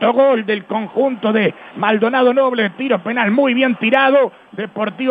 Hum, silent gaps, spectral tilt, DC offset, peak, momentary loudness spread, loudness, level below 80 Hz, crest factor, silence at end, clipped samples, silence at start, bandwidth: none; none; -8 dB/octave; under 0.1%; 0 dBFS; 8 LU; -16 LUFS; -72 dBFS; 16 dB; 0 s; under 0.1%; 0 s; 4.8 kHz